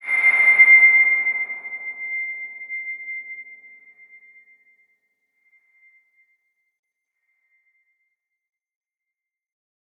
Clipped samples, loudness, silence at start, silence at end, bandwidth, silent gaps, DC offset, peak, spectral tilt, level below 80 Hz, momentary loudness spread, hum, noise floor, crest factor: under 0.1%; -15 LUFS; 0.05 s; 6.45 s; 11 kHz; none; under 0.1%; -4 dBFS; -1 dB/octave; under -90 dBFS; 22 LU; none; -87 dBFS; 20 dB